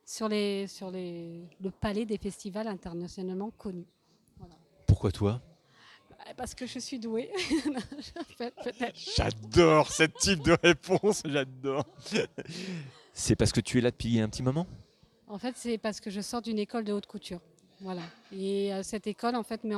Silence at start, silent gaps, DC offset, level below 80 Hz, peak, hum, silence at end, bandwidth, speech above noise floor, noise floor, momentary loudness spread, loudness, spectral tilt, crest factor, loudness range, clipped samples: 0.1 s; none; under 0.1%; -48 dBFS; -8 dBFS; none; 0 s; 14.5 kHz; 28 dB; -59 dBFS; 17 LU; -30 LUFS; -5 dB/octave; 22 dB; 10 LU; under 0.1%